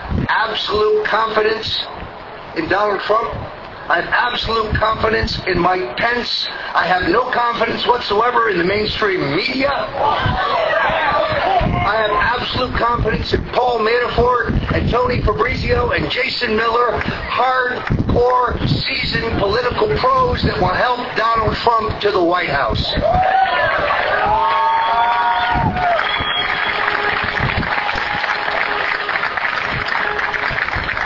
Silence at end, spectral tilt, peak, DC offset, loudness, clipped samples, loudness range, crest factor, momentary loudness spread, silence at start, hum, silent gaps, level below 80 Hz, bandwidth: 0 s; -6 dB/octave; 0 dBFS; under 0.1%; -16 LUFS; under 0.1%; 2 LU; 16 dB; 3 LU; 0 s; none; none; -32 dBFS; 6 kHz